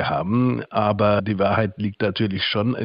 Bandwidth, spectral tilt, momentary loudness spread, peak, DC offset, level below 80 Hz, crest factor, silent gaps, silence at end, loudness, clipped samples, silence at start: 5.6 kHz; -10.5 dB/octave; 4 LU; -6 dBFS; under 0.1%; -52 dBFS; 16 dB; none; 0 s; -21 LUFS; under 0.1%; 0 s